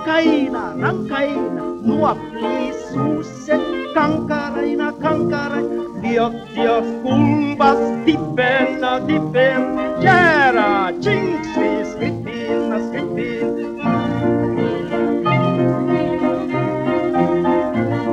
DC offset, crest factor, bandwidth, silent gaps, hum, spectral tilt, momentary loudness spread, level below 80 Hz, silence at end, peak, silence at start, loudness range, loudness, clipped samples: under 0.1%; 16 dB; 9.2 kHz; none; none; -7 dB/octave; 7 LU; -48 dBFS; 0 s; -2 dBFS; 0 s; 5 LU; -18 LUFS; under 0.1%